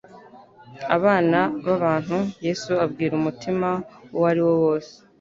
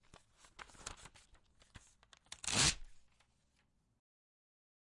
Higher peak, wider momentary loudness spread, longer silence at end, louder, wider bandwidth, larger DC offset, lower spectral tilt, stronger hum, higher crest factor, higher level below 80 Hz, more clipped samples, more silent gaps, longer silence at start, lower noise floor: first, -2 dBFS vs -20 dBFS; second, 8 LU vs 25 LU; second, 0.3 s vs 2 s; first, -22 LUFS vs -34 LUFS; second, 7.6 kHz vs 11.5 kHz; neither; first, -7 dB/octave vs -1 dB/octave; neither; second, 20 dB vs 26 dB; about the same, -60 dBFS vs -60 dBFS; neither; neither; second, 0.1 s vs 0.6 s; second, -47 dBFS vs -78 dBFS